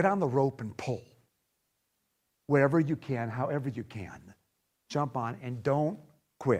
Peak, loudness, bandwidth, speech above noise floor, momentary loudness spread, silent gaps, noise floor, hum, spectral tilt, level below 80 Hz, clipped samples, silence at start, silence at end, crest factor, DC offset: -10 dBFS; -31 LUFS; 10.5 kHz; 49 dB; 16 LU; none; -79 dBFS; none; -8 dB/octave; -68 dBFS; under 0.1%; 0 s; 0 s; 22 dB; under 0.1%